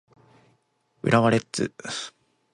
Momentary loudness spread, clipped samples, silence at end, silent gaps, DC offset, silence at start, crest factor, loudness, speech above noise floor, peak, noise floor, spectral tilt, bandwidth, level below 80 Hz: 13 LU; under 0.1%; 0.45 s; none; under 0.1%; 1.05 s; 22 dB; -24 LUFS; 45 dB; -6 dBFS; -69 dBFS; -5.5 dB/octave; 11.5 kHz; -62 dBFS